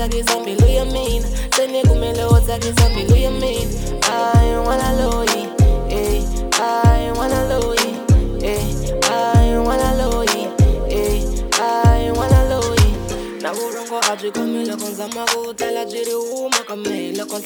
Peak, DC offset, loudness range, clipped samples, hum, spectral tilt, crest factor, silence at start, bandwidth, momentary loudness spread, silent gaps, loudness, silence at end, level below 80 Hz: 0 dBFS; under 0.1%; 4 LU; under 0.1%; none; -5 dB/octave; 16 dB; 0 s; over 20 kHz; 8 LU; none; -18 LUFS; 0 s; -20 dBFS